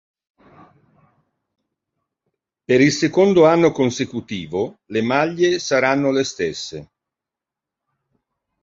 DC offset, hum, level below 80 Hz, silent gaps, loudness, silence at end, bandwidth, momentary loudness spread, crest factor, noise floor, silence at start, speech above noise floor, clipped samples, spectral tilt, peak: under 0.1%; none; -58 dBFS; none; -18 LUFS; 1.8 s; 7.8 kHz; 13 LU; 20 dB; -86 dBFS; 2.7 s; 69 dB; under 0.1%; -5 dB/octave; -2 dBFS